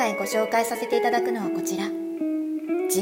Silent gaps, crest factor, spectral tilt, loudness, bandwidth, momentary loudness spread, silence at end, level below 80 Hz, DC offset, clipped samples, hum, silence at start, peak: none; 14 dB; -3.5 dB/octave; -25 LUFS; 16.5 kHz; 6 LU; 0 s; -74 dBFS; under 0.1%; under 0.1%; none; 0 s; -10 dBFS